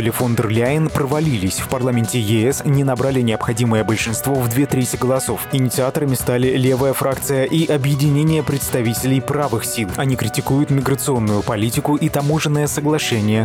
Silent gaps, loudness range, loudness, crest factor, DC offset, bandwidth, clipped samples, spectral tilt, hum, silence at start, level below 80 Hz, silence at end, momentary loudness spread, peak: none; 1 LU; -18 LUFS; 12 dB; under 0.1%; 18.5 kHz; under 0.1%; -5.5 dB/octave; none; 0 s; -44 dBFS; 0 s; 3 LU; -6 dBFS